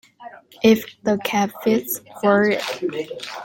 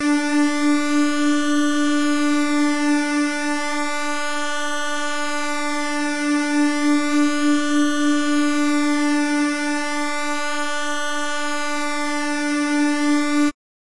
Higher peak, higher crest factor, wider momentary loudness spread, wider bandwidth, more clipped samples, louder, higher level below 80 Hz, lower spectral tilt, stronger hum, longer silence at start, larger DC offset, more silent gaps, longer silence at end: first, -2 dBFS vs -10 dBFS; first, 18 dB vs 8 dB; first, 10 LU vs 5 LU; first, 17 kHz vs 11.5 kHz; neither; about the same, -20 LUFS vs -20 LUFS; about the same, -62 dBFS vs -60 dBFS; first, -4.5 dB/octave vs -2 dB/octave; neither; first, 0.2 s vs 0 s; neither; neither; second, 0 s vs 0.45 s